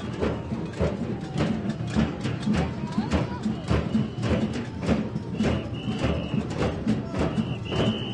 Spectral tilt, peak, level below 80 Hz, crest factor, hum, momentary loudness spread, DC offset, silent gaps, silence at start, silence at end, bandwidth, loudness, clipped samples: -7 dB/octave; -10 dBFS; -40 dBFS; 16 dB; none; 4 LU; under 0.1%; none; 0 s; 0 s; 11 kHz; -27 LUFS; under 0.1%